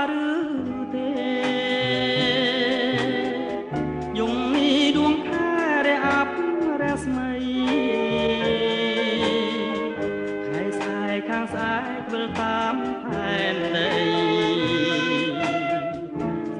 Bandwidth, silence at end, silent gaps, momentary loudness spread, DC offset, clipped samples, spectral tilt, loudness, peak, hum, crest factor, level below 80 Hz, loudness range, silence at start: 10.5 kHz; 0 s; none; 7 LU; under 0.1%; under 0.1%; -5 dB/octave; -23 LUFS; -8 dBFS; none; 16 dB; -52 dBFS; 4 LU; 0 s